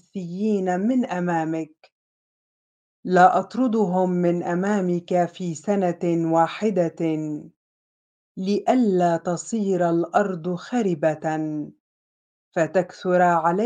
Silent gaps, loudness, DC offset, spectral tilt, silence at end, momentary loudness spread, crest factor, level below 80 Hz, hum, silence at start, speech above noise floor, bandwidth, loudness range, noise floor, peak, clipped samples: 1.92-3.03 s, 7.56-8.35 s, 11.80-12.52 s; -22 LUFS; under 0.1%; -7 dB/octave; 0 s; 11 LU; 20 dB; -74 dBFS; none; 0.15 s; over 68 dB; 9.4 kHz; 3 LU; under -90 dBFS; -4 dBFS; under 0.1%